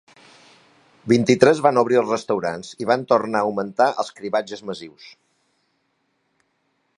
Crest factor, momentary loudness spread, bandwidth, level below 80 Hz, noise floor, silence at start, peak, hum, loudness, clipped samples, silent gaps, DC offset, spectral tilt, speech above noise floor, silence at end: 22 dB; 17 LU; 11 kHz; -64 dBFS; -70 dBFS; 1.05 s; 0 dBFS; none; -20 LUFS; under 0.1%; none; under 0.1%; -5.5 dB/octave; 50 dB; 1.9 s